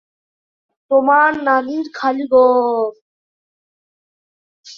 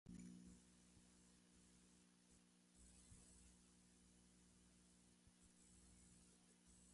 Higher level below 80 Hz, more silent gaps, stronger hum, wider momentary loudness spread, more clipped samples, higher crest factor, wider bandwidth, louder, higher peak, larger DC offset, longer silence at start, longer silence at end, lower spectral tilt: first, -64 dBFS vs -78 dBFS; first, 3.01-4.63 s vs none; second, none vs 60 Hz at -75 dBFS; about the same, 9 LU vs 8 LU; neither; about the same, 16 dB vs 20 dB; second, 7 kHz vs 11.5 kHz; first, -15 LUFS vs -66 LUFS; first, -2 dBFS vs -48 dBFS; neither; first, 0.9 s vs 0.05 s; about the same, 0.05 s vs 0 s; about the same, -4.5 dB/octave vs -4 dB/octave